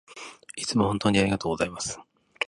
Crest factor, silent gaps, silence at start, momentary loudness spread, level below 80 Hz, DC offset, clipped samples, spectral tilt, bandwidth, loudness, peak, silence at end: 20 dB; none; 0.1 s; 18 LU; -50 dBFS; under 0.1%; under 0.1%; -4.5 dB/octave; 11.5 kHz; -26 LUFS; -6 dBFS; 0 s